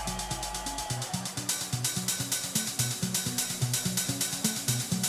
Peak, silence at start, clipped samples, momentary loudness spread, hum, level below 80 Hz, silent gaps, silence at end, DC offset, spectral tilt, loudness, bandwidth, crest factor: -12 dBFS; 0 s; under 0.1%; 5 LU; none; -50 dBFS; none; 0 s; under 0.1%; -2.5 dB/octave; -30 LUFS; 16 kHz; 18 dB